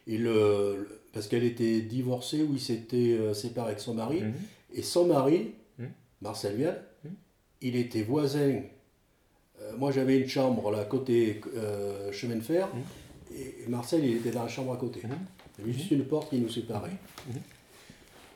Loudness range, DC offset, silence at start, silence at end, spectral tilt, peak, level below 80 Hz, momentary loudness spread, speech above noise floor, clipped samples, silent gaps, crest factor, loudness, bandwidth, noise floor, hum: 4 LU; under 0.1%; 0.05 s; 0.1 s; -6.5 dB/octave; -12 dBFS; -68 dBFS; 17 LU; 38 dB; under 0.1%; none; 18 dB; -30 LUFS; 18 kHz; -67 dBFS; none